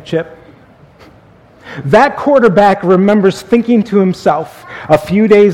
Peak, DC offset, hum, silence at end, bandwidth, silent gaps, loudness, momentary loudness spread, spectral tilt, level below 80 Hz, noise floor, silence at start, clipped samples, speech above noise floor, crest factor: 0 dBFS; under 0.1%; none; 0 s; 14 kHz; none; -10 LUFS; 16 LU; -7 dB/octave; -46 dBFS; -42 dBFS; 0.05 s; 0.5%; 32 dB; 12 dB